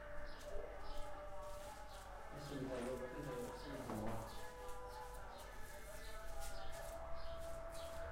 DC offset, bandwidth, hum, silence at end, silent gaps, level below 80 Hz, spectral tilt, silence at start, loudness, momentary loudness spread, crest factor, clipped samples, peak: under 0.1%; 16 kHz; none; 0 s; none; -54 dBFS; -5 dB/octave; 0 s; -51 LUFS; 8 LU; 16 dB; under 0.1%; -32 dBFS